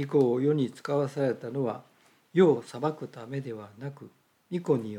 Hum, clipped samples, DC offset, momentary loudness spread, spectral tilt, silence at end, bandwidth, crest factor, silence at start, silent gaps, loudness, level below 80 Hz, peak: none; under 0.1%; under 0.1%; 17 LU; -8 dB/octave; 0 s; 12 kHz; 18 dB; 0 s; none; -28 LUFS; -82 dBFS; -10 dBFS